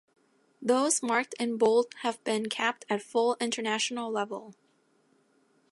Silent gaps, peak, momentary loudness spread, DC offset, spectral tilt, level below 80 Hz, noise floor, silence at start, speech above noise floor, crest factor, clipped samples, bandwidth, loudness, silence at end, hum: none; -12 dBFS; 8 LU; under 0.1%; -2.5 dB/octave; -82 dBFS; -69 dBFS; 0.6 s; 40 dB; 18 dB; under 0.1%; 11.5 kHz; -29 LUFS; 1.2 s; none